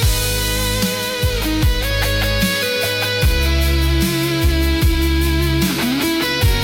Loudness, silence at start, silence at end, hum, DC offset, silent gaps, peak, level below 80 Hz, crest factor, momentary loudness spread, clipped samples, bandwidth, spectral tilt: -17 LUFS; 0 s; 0 s; none; under 0.1%; none; -6 dBFS; -20 dBFS; 10 dB; 2 LU; under 0.1%; 17 kHz; -4.5 dB/octave